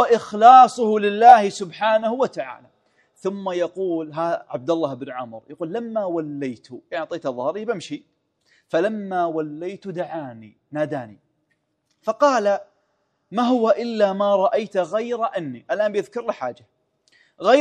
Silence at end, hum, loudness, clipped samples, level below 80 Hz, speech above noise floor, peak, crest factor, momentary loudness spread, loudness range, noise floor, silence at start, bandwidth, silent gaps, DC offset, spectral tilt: 0 s; none; -20 LUFS; under 0.1%; -72 dBFS; 51 dB; 0 dBFS; 20 dB; 17 LU; 9 LU; -71 dBFS; 0 s; 10 kHz; none; under 0.1%; -5.5 dB/octave